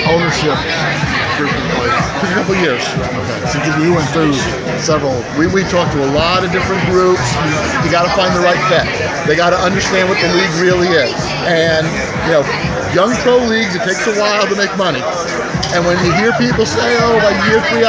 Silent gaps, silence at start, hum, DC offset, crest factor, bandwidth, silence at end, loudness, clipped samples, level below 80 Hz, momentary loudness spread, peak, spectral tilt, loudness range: none; 0 s; none; under 0.1%; 14 dB; 8 kHz; 0 s; -13 LUFS; under 0.1%; -34 dBFS; 5 LU; 0 dBFS; -4.5 dB/octave; 2 LU